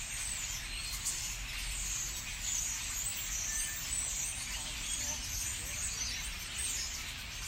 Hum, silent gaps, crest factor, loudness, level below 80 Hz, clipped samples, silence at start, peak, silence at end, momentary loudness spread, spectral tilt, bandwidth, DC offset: none; none; 16 dB; -35 LUFS; -48 dBFS; under 0.1%; 0 s; -22 dBFS; 0 s; 4 LU; 0 dB/octave; 16 kHz; under 0.1%